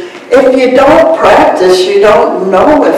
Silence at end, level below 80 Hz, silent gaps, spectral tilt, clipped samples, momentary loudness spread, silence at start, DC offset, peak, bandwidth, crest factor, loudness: 0 s; -36 dBFS; none; -5 dB/octave; 10%; 3 LU; 0 s; under 0.1%; 0 dBFS; 14.5 kHz; 6 dB; -6 LUFS